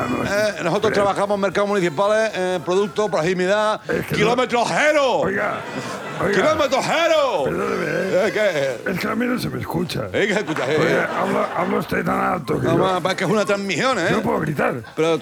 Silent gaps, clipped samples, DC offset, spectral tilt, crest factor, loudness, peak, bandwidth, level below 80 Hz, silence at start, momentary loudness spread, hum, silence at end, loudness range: none; under 0.1%; under 0.1%; -5 dB/octave; 16 dB; -20 LUFS; -4 dBFS; 19.5 kHz; -52 dBFS; 0 s; 6 LU; none; 0 s; 2 LU